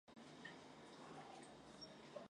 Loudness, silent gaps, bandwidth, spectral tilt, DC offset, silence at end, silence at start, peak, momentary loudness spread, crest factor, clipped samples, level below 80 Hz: -59 LUFS; none; 11 kHz; -4 dB/octave; under 0.1%; 0 s; 0.05 s; -40 dBFS; 3 LU; 18 dB; under 0.1%; -84 dBFS